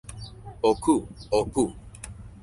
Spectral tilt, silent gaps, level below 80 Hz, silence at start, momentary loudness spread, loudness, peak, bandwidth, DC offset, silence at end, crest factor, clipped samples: -5.5 dB/octave; none; -46 dBFS; 0.05 s; 18 LU; -25 LUFS; -8 dBFS; 11.5 kHz; under 0.1%; 0.05 s; 18 dB; under 0.1%